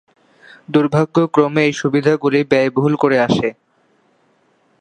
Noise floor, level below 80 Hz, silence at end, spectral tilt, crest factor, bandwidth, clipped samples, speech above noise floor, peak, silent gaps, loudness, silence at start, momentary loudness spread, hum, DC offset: -58 dBFS; -56 dBFS; 1.3 s; -6.5 dB/octave; 16 dB; 9.6 kHz; under 0.1%; 44 dB; 0 dBFS; none; -16 LUFS; 0.7 s; 3 LU; none; under 0.1%